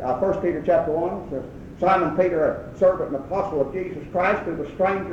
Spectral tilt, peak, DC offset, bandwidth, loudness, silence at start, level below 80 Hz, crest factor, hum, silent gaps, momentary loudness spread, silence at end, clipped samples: -8 dB/octave; -6 dBFS; under 0.1%; 7.6 kHz; -23 LUFS; 0 s; -48 dBFS; 16 dB; none; none; 10 LU; 0 s; under 0.1%